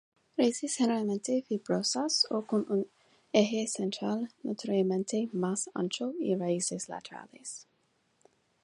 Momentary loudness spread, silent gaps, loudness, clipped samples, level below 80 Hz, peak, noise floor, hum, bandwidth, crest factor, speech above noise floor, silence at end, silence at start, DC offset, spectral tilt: 14 LU; none; -31 LUFS; under 0.1%; -80 dBFS; -10 dBFS; -73 dBFS; none; 11.5 kHz; 22 dB; 42 dB; 1 s; 0.4 s; under 0.1%; -4 dB/octave